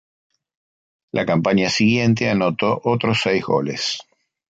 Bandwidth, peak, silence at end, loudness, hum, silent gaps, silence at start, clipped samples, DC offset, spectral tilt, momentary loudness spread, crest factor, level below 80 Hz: 9 kHz; -4 dBFS; 0.5 s; -19 LUFS; none; none; 1.15 s; under 0.1%; under 0.1%; -5.5 dB/octave; 8 LU; 16 dB; -54 dBFS